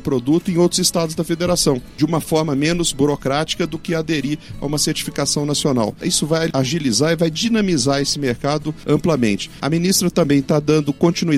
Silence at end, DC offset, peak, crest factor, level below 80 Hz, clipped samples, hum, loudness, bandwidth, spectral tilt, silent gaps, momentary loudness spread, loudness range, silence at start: 0 s; under 0.1%; -4 dBFS; 14 dB; -42 dBFS; under 0.1%; none; -18 LUFS; 16 kHz; -4.5 dB/octave; none; 5 LU; 2 LU; 0 s